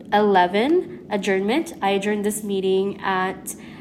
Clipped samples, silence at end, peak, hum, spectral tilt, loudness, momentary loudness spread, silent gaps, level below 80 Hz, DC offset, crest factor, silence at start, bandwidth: under 0.1%; 0 s; -4 dBFS; none; -4.5 dB/octave; -21 LUFS; 9 LU; none; -60 dBFS; under 0.1%; 18 dB; 0 s; 15 kHz